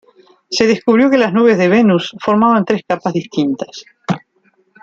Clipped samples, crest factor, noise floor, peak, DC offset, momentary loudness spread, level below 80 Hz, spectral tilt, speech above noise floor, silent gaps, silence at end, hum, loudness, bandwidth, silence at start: under 0.1%; 14 dB; -58 dBFS; 0 dBFS; under 0.1%; 12 LU; -58 dBFS; -6 dB/octave; 45 dB; none; 0.65 s; none; -14 LUFS; 7.6 kHz; 0.5 s